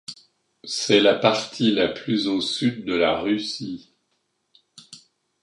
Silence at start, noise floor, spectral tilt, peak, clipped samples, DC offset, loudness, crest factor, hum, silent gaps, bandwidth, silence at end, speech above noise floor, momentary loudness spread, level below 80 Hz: 0.1 s; -72 dBFS; -4 dB/octave; -2 dBFS; under 0.1%; under 0.1%; -22 LUFS; 22 dB; none; none; 11.5 kHz; 0.45 s; 51 dB; 16 LU; -60 dBFS